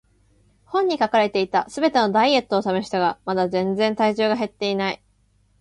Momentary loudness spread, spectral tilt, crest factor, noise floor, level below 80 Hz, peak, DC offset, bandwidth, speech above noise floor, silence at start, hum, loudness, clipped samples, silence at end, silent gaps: 6 LU; -5.5 dB/octave; 18 dB; -61 dBFS; -60 dBFS; -4 dBFS; under 0.1%; 11.5 kHz; 41 dB; 0.7 s; 50 Hz at -45 dBFS; -21 LUFS; under 0.1%; 0.65 s; none